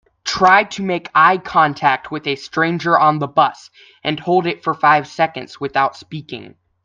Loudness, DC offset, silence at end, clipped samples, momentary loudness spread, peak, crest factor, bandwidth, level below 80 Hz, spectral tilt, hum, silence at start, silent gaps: -16 LUFS; under 0.1%; 0.35 s; under 0.1%; 12 LU; 0 dBFS; 16 dB; 7.6 kHz; -56 dBFS; -5 dB/octave; none; 0.25 s; none